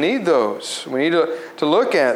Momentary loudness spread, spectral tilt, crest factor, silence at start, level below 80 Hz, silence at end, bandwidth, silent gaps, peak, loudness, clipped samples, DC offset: 8 LU; -4 dB/octave; 14 dB; 0 s; -78 dBFS; 0 s; 13.5 kHz; none; -4 dBFS; -19 LUFS; under 0.1%; under 0.1%